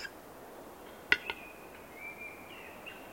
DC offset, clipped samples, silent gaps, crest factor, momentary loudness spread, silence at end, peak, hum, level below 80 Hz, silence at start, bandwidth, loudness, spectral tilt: under 0.1%; under 0.1%; none; 36 dB; 19 LU; 0 s; -6 dBFS; none; -68 dBFS; 0 s; 16.5 kHz; -37 LUFS; -2.5 dB/octave